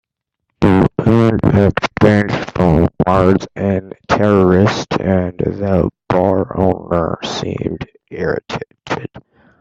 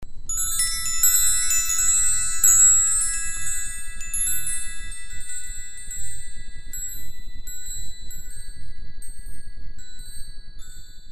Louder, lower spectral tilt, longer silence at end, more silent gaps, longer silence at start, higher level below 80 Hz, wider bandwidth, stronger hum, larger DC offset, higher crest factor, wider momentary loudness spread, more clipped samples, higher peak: first, -15 LUFS vs -19 LUFS; first, -7.5 dB/octave vs 1.5 dB/octave; first, 0.4 s vs 0 s; neither; first, 0.6 s vs 0 s; about the same, -38 dBFS vs -36 dBFS; second, 8.2 kHz vs 15.5 kHz; neither; neither; about the same, 14 dB vs 18 dB; second, 12 LU vs 25 LU; neither; first, 0 dBFS vs -4 dBFS